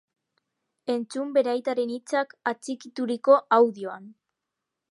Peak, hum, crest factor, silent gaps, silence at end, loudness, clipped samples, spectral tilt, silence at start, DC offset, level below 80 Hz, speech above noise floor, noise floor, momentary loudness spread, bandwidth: -6 dBFS; none; 20 dB; none; 0.8 s; -25 LUFS; under 0.1%; -4.5 dB/octave; 0.85 s; under 0.1%; -84 dBFS; 60 dB; -85 dBFS; 16 LU; 11.5 kHz